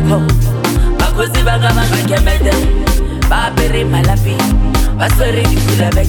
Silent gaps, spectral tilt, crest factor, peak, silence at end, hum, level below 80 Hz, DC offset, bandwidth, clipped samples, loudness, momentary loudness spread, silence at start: none; -5.5 dB/octave; 10 dB; 0 dBFS; 0 s; none; -14 dBFS; under 0.1%; 19 kHz; under 0.1%; -13 LUFS; 2 LU; 0 s